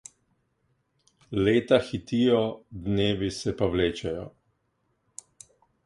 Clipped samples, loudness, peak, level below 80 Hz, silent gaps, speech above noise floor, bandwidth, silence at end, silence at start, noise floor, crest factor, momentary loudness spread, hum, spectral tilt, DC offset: under 0.1%; -26 LUFS; -8 dBFS; -50 dBFS; none; 48 dB; 11.5 kHz; 1.55 s; 1.3 s; -74 dBFS; 20 dB; 22 LU; none; -6 dB/octave; under 0.1%